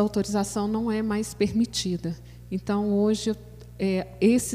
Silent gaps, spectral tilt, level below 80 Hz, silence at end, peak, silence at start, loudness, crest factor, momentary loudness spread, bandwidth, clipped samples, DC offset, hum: none; -5.5 dB/octave; -48 dBFS; 0 s; -8 dBFS; 0 s; -26 LUFS; 16 dB; 11 LU; 15.5 kHz; under 0.1%; under 0.1%; none